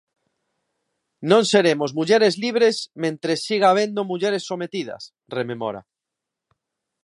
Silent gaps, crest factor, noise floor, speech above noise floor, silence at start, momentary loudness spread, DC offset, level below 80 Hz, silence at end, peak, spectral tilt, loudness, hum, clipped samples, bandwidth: none; 20 dB; -85 dBFS; 64 dB; 1.2 s; 13 LU; under 0.1%; -72 dBFS; 1.25 s; -2 dBFS; -4.5 dB/octave; -20 LUFS; none; under 0.1%; 11.5 kHz